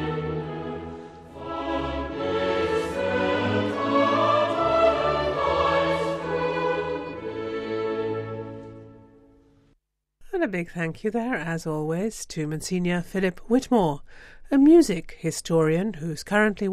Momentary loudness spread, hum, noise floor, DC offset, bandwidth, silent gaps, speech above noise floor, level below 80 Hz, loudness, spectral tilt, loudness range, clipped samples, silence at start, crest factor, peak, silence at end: 13 LU; none; -69 dBFS; under 0.1%; 15 kHz; none; 46 dB; -48 dBFS; -25 LUFS; -6 dB/octave; 10 LU; under 0.1%; 0 s; 18 dB; -8 dBFS; 0 s